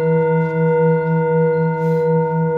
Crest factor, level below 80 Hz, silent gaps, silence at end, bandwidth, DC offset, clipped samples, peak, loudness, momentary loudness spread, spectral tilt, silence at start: 10 dB; -56 dBFS; none; 0 s; 3.7 kHz; under 0.1%; under 0.1%; -6 dBFS; -16 LUFS; 2 LU; -11 dB/octave; 0 s